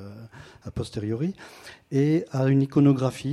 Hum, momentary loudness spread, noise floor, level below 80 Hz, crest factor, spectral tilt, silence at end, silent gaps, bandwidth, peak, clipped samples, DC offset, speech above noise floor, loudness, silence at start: none; 23 LU; -45 dBFS; -54 dBFS; 18 dB; -8 dB/octave; 0 s; none; 12 kHz; -8 dBFS; under 0.1%; under 0.1%; 21 dB; -24 LUFS; 0 s